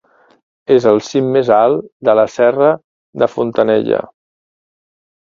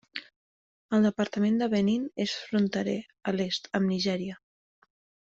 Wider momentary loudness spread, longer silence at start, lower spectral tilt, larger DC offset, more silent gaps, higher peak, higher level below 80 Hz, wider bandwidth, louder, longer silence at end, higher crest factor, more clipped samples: about the same, 7 LU vs 9 LU; first, 0.7 s vs 0.15 s; about the same, -6.5 dB/octave vs -6 dB/octave; neither; second, 1.92-2.00 s, 2.84-3.13 s vs 0.36-0.89 s; first, 0 dBFS vs -12 dBFS; first, -58 dBFS vs -68 dBFS; about the same, 7.4 kHz vs 7.6 kHz; first, -14 LUFS vs -28 LUFS; first, 1.2 s vs 0.9 s; about the same, 14 dB vs 18 dB; neither